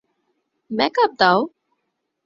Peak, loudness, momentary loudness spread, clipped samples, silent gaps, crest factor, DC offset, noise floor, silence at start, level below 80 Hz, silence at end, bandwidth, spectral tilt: 0 dBFS; -18 LUFS; 13 LU; under 0.1%; none; 22 dB; under 0.1%; -75 dBFS; 0.7 s; -62 dBFS; 0.8 s; 7.4 kHz; -5.5 dB/octave